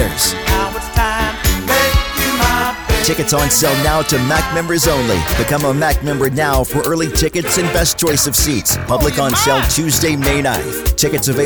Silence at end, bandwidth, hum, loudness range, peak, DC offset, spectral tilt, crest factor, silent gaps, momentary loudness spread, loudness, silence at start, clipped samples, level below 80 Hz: 0 s; over 20 kHz; none; 1 LU; -2 dBFS; under 0.1%; -3.5 dB/octave; 14 dB; none; 4 LU; -14 LUFS; 0 s; under 0.1%; -24 dBFS